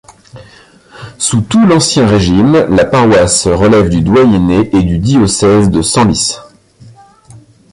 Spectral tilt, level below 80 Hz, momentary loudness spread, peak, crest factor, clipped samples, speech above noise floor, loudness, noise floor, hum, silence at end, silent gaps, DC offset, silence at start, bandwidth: -5 dB/octave; -30 dBFS; 5 LU; 0 dBFS; 10 dB; under 0.1%; 32 dB; -9 LUFS; -40 dBFS; none; 0.35 s; none; under 0.1%; 0.35 s; 11.5 kHz